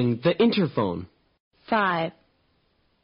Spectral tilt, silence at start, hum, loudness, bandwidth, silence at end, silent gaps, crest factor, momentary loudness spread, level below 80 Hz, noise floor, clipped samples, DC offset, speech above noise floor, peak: -4.5 dB/octave; 0 s; none; -24 LUFS; 5.4 kHz; 0.95 s; 1.40-1.51 s; 16 dB; 10 LU; -62 dBFS; -68 dBFS; under 0.1%; under 0.1%; 44 dB; -10 dBFS